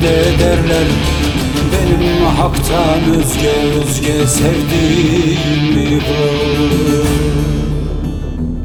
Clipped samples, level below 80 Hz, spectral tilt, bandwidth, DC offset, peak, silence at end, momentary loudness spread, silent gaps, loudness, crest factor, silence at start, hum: under 0.1%; -22 dBFS; -5.5 dB/octave; over 20 kHz; under 0.1%; 0 dBFS; 0 s; 5 LU; none; -13 LUFS; 12 dB; 0 s; none